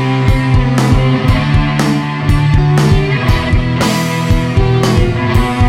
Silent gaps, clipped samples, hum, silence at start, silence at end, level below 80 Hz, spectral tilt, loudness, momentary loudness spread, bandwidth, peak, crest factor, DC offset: none; under 0.1%; none; 0 s; 0 s; -18 dBFS; -6.5 dB/octave; -12 LUFS; 3 LU; 16 kHz; 0 dBFS; 10 dB; under 0.1%